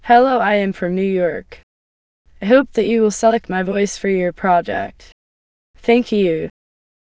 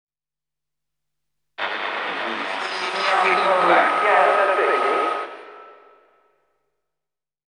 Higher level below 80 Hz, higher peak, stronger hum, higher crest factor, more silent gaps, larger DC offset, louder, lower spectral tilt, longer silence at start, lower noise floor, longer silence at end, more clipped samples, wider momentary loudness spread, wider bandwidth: first, -50 dBFS vs -84 dBFS; about the same, 0 dBFS vs -2 dBFS; neither; about the same, 18 dB vs 20 dB; first, 1.63-2.25 s, 5.12-5.74 s vs none; neither; about the same, -17 LUFS vs -19 LUFS; first, -5.5 dB/octave vs -3 dB/octave; second, 0.05 s vs 1.6 s; about the same, under -90 dBFS vs under -90 dBFS; second, 0.6 s vs 1.75 s; neither; about the same, 10 LU vs 11 LU; second, 8 kHz vs 10.5 kHz